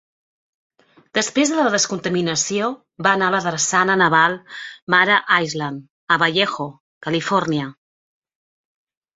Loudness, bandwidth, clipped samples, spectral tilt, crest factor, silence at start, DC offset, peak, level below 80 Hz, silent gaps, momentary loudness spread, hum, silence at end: -18 LUFS; 8.2 kHz; under 0.1%; -3 dB/octave; 20 dB; 1.15 s; under 0.1%; -2 dBFS; -64 dBFS; 4.82-4.87 s, 5.90-6.07 s, 6.80-7.01 s; 15 LU; none; 1.45 s